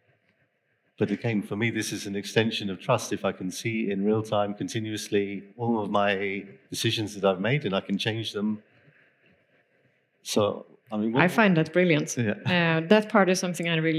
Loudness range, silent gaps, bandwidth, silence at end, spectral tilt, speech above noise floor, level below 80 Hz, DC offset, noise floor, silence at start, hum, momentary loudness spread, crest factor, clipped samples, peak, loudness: 7 LU; none; 15 kHz; 0 s; -5 dB/octave; 46 dB; -80 dBFS; under 0.1%; -72 dBFS; 1 s; none; 10 LU; 24 dB; under 0.1%; -4 dBFS; -26 LUFS